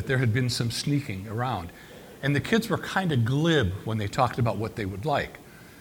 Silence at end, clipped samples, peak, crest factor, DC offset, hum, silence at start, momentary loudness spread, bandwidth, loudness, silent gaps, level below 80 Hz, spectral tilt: 0 s; under 0.1%; -8 dBFS; 20 dB; under 0.1%; none; 0 s; 10 LU; 19 kHz; -27 LUFS; none; -52 dBFS; -6 dB/octave